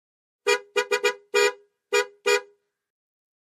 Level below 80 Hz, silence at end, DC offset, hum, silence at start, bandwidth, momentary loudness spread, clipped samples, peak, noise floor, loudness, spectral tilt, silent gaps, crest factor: -86 dBFS; 1 s; under 0.1%; none; 0.45 s; 15.5 kHz; 3 LU; under 0.1%; -8 dBFS; -55 dBFS; -24 LUFS; 1 dB/octave; none; 18 dB